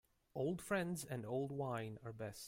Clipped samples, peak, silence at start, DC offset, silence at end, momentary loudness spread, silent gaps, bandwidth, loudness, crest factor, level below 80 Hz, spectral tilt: under 0.1%; -26 dBFS; 0.35 s; under 0.1%; 0 s; 9 LU; none; 16 kHz; -44 LUFS; 18 dB; -72 dBFS; -5.5 dB/octave